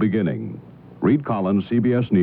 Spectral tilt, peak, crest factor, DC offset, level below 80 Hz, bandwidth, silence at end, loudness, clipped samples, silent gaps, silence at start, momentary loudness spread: -11.5 dB/octave; -6 dBFS; 14 dB; under 0.1%; -56 dBFS; 4.3 kHz; 0 s; -21 LUFS; under 0.1%; none; 0 s; 12 LU